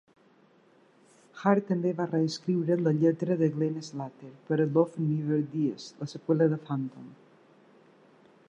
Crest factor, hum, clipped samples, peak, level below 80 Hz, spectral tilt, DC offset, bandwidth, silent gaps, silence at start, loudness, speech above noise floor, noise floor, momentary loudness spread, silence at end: 20 dB; none; under 0.1%; -10 dBFS; -80 dBFS; -8 dB/octave; under 0.1%; 8.4 kHz; none; 1.35 s; -29 LUFS; 34 dB; -62 dBFS; 14 LU; 1.35 s